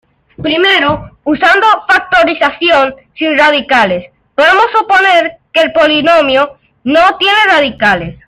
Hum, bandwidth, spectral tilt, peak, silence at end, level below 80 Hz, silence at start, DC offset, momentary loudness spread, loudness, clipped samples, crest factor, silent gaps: none; 14 kHz; -4 dB/octave; 0 dBFS; 0.15 s; -42 dBFS; 0.4 s; under 0.1%; 9 LU; -9 LUFS; under 0.1%; 10 dB; none